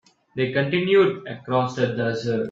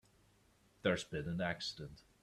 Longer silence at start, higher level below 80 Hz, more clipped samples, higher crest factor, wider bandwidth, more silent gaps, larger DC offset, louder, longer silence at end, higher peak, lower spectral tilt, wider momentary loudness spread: second, 0.35 s vs 0.85 s; about the same, -62 dBFS vs -66 dBFS; neither; second, 16 dB vs 22 dB; second, 7.4 kHz vs 13 kHz; neither; neither; first, -22 LUFS vs -40 LUFS; second, 0 s vs 0.25 s; first, -6 dBFS vs -20 dBFS; first, -7 dB/octave vs -5 dB/octave; second, 9 LU vs 12 LU